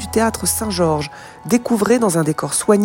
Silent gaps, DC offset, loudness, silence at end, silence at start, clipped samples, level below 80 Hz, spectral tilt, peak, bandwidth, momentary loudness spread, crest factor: none; under 0.1%; -17 LUFS; 0 s; 0 s; under 0.1%; -42 dBFS; -4.5 dB/octave; 0 dBFS; 16.5 kHz; 7 LU; 16 dB